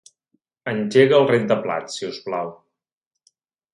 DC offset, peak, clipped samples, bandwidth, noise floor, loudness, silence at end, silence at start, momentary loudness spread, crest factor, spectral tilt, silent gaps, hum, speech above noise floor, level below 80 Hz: under 0.1%; -2 dBFS; under 0.1%; 11 kHz; -84 dBFS; -20 LUFS; 1.2 s; 0.65 s; 15 LU; 20 dB; -5.5 dB/octave; none; none; 65 dB; -68 dBFS